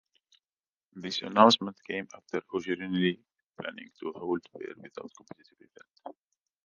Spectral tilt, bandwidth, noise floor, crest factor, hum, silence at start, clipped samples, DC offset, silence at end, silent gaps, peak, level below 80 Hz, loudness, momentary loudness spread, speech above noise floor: -5 dB/octave; 9.6 kHz; under -90 dBFS; 28 dB; none; 0.95 s; under 0.1%; under 0.1%; 0.55 s; 3.43-3.52 s; -4 dBFS; -74 dBFS; -29 LUFS; 25 LU; over 59 dB